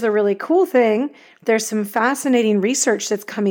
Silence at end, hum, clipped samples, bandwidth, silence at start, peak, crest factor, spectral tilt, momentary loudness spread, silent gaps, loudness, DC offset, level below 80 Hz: 0 s; none; under 0.1%; over 20 kHz; 0 s; -4 dBFS; 14 dB; -4 dB/octave; 6 LU; none; -18 LUFS; under 0.1%; -82 dBFS